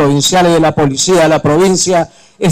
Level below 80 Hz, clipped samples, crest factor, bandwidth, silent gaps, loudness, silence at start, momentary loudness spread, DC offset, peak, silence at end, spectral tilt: -40 dBFS; under 0.1%; 6 dB; 16 kHz; none; -10 LUFS; 0 s; 6 LU; under 0.1%; -4 dBFS; 0 s; -4.5 dB/octave